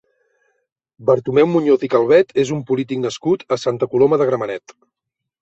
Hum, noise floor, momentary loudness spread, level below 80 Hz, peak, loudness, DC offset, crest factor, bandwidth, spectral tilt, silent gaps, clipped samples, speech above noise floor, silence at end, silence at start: none; -81 dBFS; 9 LU; -60 dBFS; -2 dBFS; -17 LUFS; under 0.1%; 16 dB; 8 kHz; -6.5 dB/octave; none; under 0.1%; 65 dB; 0.7 s; 1 s